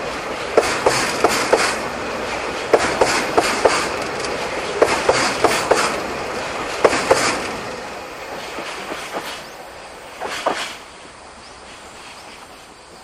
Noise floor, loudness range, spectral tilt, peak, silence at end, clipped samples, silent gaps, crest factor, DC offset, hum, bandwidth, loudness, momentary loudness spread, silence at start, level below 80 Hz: -41 dBFS; 11 LU; -2.5 dB/octave; 0 dBFS; 0 s; under 0.1%; none; 20 dB; under 0.1%; none; 15.5 kHz; -19 LUFS; 21 LU; 0 s; -46 dBFS